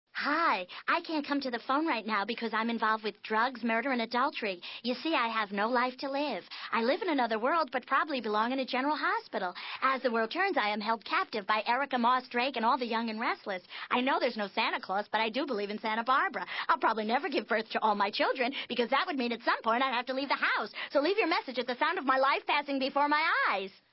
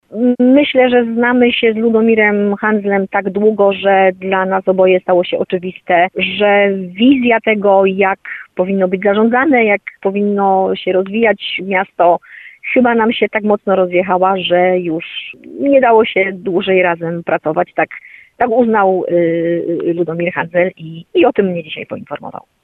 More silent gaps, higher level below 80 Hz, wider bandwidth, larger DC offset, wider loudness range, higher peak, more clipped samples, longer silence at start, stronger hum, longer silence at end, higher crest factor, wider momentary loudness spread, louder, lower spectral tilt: neither; second, -84 dBFS vs -56 dBFS; first, 5.8 kHz vs 4.3 kHz; neither; about the same, 2 LU vs 3 LU; second, -14 dBFS vs 0 dBFS; neither; about the same, 0.15 s vs 0.1 s; neither; about the same, 0.25 s vs 0.25 s; about the same, 16 dB vs 14 dB; second, 5 LU vs 9 LU; second, -30 LUFS vs -13 LUFS; about the same, -7.5 dB/octave vs -8.5 dB/octave